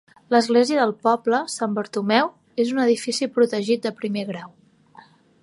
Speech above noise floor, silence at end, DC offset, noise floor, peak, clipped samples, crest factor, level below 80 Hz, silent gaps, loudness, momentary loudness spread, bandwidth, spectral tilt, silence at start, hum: 30 dB; 0.95 s; under 0.1%; -50 dBFS; -2 dBFS; under 0.1%; 20 dB; -74 dBFS; none; -21 LUFS; 9 LU; 11.5 kHz; -4.5 dB/octave; 0.3 s; none